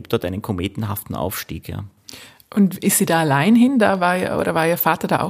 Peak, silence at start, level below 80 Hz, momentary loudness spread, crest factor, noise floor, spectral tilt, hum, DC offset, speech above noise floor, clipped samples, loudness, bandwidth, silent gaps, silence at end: -2 dBFS; 0 s; -48 dBFS; 17 LU; 16 dB; -42 dBFS; -5 dB/octave; none; under 0.1%; 23 dB; under 0.1%; -18 LUFS; 15.5 kHz; none; 0 s